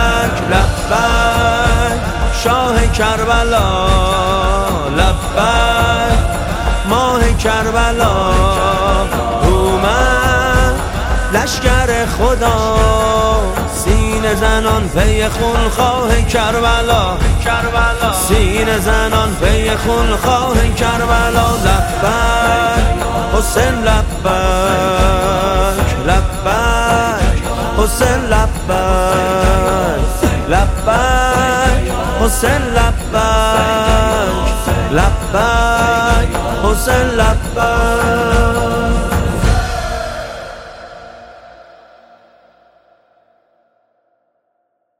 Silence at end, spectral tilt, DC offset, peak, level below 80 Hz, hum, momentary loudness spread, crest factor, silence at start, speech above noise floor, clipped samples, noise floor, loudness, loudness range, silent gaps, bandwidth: 3.45 s; -4.5 dB/octave; under 0.1%; 0 dBFS; -18 dBFS; none; 4 LU; 12 dB; 0 s; 54 dB; under 0.1%; -66 dBFS; -13 LUFS; 1 LU; none; 16.5 kHz